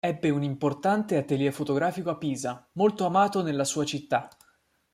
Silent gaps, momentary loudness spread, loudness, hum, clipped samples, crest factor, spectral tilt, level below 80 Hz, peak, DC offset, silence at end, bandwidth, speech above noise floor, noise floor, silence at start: none; 7 LU; -27 LUFS; none; under 0.1%; 18 dB; -5.5 dB/octave; -68 dBFS; -10 dBFS; under 0.1%; 0.65 s; 15.5 kHz; 41 dB; -67 dBFS; 0.05 s